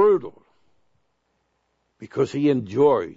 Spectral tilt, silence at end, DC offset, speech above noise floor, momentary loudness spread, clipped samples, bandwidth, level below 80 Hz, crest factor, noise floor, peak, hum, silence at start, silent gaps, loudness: -8 dB/octave; 0.05 s; under 0.1%; 50 dB; 13 LU; under 0.1%; 7.8 kHz; -66 dBFS; 16 dB; -71 dBFS; -6 dBFS; none; 0 s; none; -21 LUFS